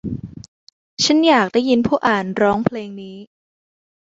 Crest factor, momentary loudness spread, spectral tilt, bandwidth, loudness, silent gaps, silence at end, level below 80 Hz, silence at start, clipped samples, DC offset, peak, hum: 18 dB; 21 LU; -4.5 dB/octave; 8 kHz; -16 LUFS; 0.48-0.97 s; 0.9 s; -50 dBFS; 0.05 s; under 0.1%; under 0.1%; -2 dBFS; none